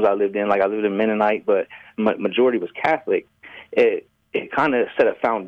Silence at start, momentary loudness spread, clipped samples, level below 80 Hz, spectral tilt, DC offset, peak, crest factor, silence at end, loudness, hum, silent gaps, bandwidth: 0 s; 6 LU; under 0.1%; -64 dBFS; -7 dB/octave; under 0.1%; -6 dBFS; 14 dB; 0 s; -21 LUFS; none; none; 6.6 kHz